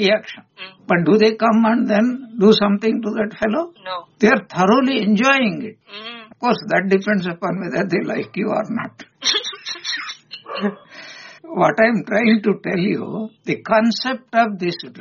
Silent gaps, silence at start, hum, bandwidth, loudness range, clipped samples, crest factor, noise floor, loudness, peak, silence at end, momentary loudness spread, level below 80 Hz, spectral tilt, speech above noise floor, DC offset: none; 0 s; none; 7.2 kHz; 6 LU; under 0.1%; 18 dB; -38 dBFS; -18 LUFS; -2 dBFS; 0 s; 18 LU; -60 dBFS; -3.5 dB/octave; 21 dB; under 0.1%